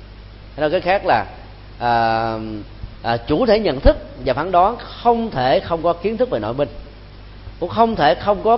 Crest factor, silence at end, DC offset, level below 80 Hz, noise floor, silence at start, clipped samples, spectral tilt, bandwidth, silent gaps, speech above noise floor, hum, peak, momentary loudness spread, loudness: 18 dB; 0 s; under 0.1%; -32 dBFS; -38 dBFS; 0 s; under 0.1%; -10.5 dB/octave; 5.8 kHz; none; 21 dB; 50 Hz at -40 dBFS; 0 dBFS; 16 LU; -18 LUFS